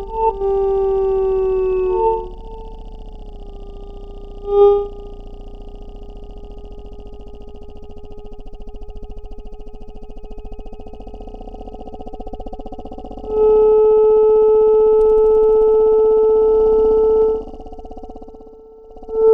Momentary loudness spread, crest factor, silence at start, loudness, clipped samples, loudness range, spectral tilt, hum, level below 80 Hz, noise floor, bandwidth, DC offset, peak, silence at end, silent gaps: 26 LU; 16 dB; 0 s; -14 LUFS; under 0.1%; 24 LU; -9 dB/octave; none; -34 dBFS; -40 dBFS; 3.8 kHz; under 0.1%; -2 dBFS; 0 s; none